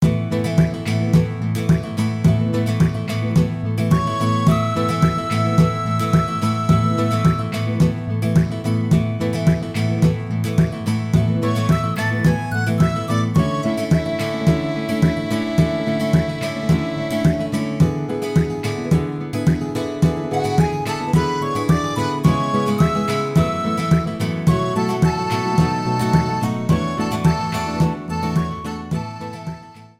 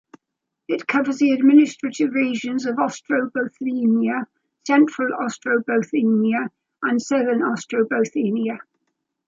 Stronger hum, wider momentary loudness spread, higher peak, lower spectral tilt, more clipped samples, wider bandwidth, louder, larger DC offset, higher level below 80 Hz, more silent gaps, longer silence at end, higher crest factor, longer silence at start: neither; second, 5 LU vs 9 LU; about the same, -2 dBFS vs -4 dBFS; first, -7 dB/octave vs -5.5 dB/octave; neither; first, 15 kHz vs 7.8 kHz; about the same, -19 LUFS vs -20 LUFS; neither; first, -36 dBFS vs -74 dBFS; neither; second, 0.15 s vs 0.7 s; about the same, 16 dB vs 16 dB; second, 0 s vs 0.7 s